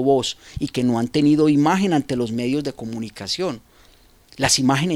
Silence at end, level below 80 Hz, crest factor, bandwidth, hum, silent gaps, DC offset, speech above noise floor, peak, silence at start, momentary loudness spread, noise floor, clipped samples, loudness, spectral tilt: 0 s; -50 dBFS; 18 dB; 14.5 kHz; none; none; under 0.1%; 33 dB; -2 dBFS; 0 s; 13 LU; -52 dBFS; under 0.1%; -20 LUFS; -4.5 dB/octave